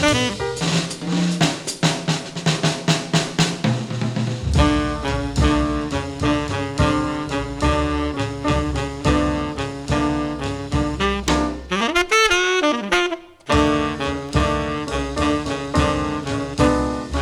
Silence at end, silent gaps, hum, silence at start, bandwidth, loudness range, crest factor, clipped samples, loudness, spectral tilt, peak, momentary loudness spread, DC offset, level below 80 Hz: 0 s; none; none; 0 s; 15 kHz; 3 LU; 18 dB; under 0.1%; -20 LUFS; -5 dB/octave; -4 dBFS; 7 LU; under 0.1%; -30 dBFS